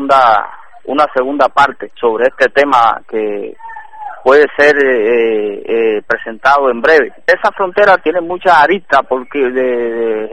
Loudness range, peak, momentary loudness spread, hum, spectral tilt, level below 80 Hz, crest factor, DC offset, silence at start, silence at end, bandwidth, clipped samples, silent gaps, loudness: 2 LU; 0 dBFS; 10 LU; none; -4.5 dB/octave; -50 dBFS; 12 dB; 2%; 0 s; 0 s; 9.6 kHz; 0.6%; none; -11 LUFS